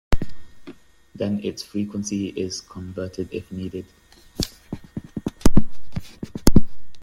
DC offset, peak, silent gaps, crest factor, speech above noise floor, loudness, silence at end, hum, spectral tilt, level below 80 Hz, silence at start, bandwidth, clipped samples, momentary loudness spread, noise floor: under 0.1%; 0 dBFS; none; 18 dB; 17 dB; -27 LUFS; 0 s; none; -5.5 dB/octave; -30 dBFS; 0.1 s; 16.5 kHz; under 0.1%; 18 LU; -45 dBFS